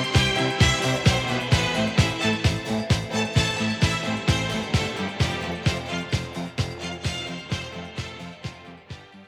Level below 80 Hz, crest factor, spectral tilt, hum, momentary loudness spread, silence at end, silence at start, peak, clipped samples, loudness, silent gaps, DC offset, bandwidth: -38 dBFS; 18 dB; -4.5 dB/octave; none; 14 LU; 0 s; 0 s; -6 dBFS; under 0.1%; -24 LUFS; none; under 0.1%; 15.5 kHz